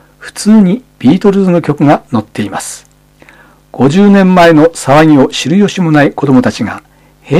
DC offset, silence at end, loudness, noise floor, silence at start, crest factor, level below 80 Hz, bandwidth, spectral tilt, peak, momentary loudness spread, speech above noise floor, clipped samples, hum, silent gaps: under 0.1%; 0 s; -8 LUFS; -41 dBFS; 0.2 s; 8 dB; -42 dBFS; 13.5 kHz; -6.5 dB/octave; 0 dBFS; 13 LU; 33 dB; 2%; none; none